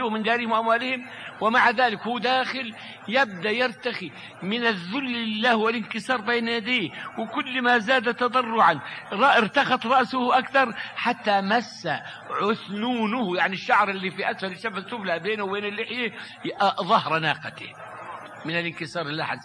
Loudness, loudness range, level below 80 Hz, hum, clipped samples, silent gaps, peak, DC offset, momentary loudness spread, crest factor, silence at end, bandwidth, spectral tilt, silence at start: -24 LUFS; 5 LU; -72 dBFS; none; under 0.1%; none; -6 dBFS; under 0.1%; 12 LU; 18 dB; 0 s; 10.5 kHz; -5 dB/octave; 0 s